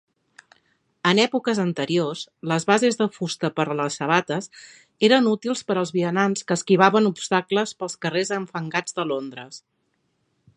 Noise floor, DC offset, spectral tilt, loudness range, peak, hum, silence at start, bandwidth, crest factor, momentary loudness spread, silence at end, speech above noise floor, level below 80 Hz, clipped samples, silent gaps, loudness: -71 dBFS; under 0.1%; -4.5 dB/octave; 3 LU; 0 dBFS; none; 1.05 s; 11.5 kHz; 22 dB; 11 LU; 1 s; 49 dB; -72 dBFS; under 0.1%; none; -22 LUFS